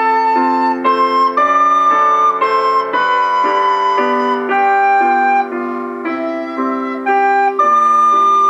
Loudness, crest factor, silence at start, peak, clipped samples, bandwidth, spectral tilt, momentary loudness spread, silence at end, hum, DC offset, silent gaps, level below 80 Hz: -13 LUFS; 12 dB; 0 s; -2 dBFS; under 0.1%; 9 kHz; -3.5 dB/octave; 9 LU; 0 s; none; under 0.1%; none; -78 dBFS